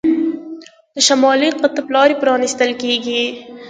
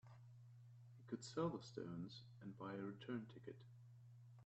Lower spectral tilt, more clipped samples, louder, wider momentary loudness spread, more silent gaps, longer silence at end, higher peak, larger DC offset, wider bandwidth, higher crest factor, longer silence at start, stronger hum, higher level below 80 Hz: second, -1.5 dB/octave vs -6.5 dB/octave; neither; first, -15 LUFS vs -51 LUFS; second, 15 LU vs 18 LU; neither; about the same, 0 s vs 0 s; first, 0 dBFS vs -32 dBFS; neither; first, 9.6 kHz vs 8.2 kHz; second, 16 dB vs 22 dB; about the same, 0.05 s vs 0.05 s; neither; first, -62 dBFS vs -82 dBFS